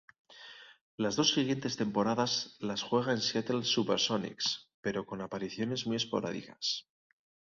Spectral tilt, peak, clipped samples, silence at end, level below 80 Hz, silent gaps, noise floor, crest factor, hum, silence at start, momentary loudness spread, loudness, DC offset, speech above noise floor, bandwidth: -4 dB/octave; -12 dBFS; under 0.1%; 0.75 s; -70 dBFS; 0.81-0.98 s, 4.74-4.83 s; -53 dBFS; 22 dB; none; 0.3 s; 10 LU; -32 LUFS; under 0.1%; 20 dB; 7.6 kHz